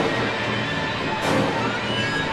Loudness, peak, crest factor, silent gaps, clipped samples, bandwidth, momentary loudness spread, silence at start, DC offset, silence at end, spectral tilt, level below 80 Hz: -23 LUFS; -8 dBFS; 14 dB; none; under 0.1%; 13.5 kHz; 3 LU; 0 s; under 0.1%; 0 s; -4.5 dB/octave; -48 dBFS